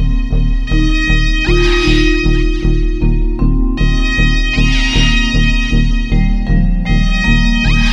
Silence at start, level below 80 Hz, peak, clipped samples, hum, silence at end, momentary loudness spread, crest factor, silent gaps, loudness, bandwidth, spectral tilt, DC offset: 0 s; -12 dBFS; 0 dBFS; under 0.1%; none; 0 s; 4 LU; 10 dB; none; -14 LUFS; 8 kHz; -5.5 dB/octave; under 0.1%